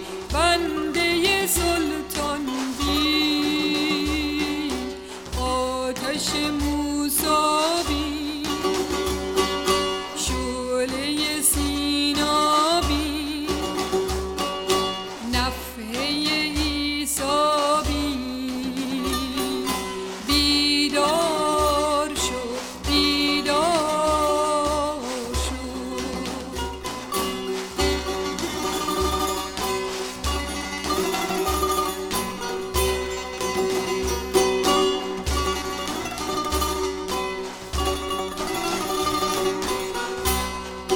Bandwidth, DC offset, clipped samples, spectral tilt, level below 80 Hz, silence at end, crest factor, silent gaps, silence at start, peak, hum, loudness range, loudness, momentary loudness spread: 19.5 kHz; under 0.1%; under 0.1%; -3 dB/octave; -36 dBFS; 0 s; 18 dB; none; 0 s; -6 dBFS; none; 4 LU; -23 LUFS; 9 LU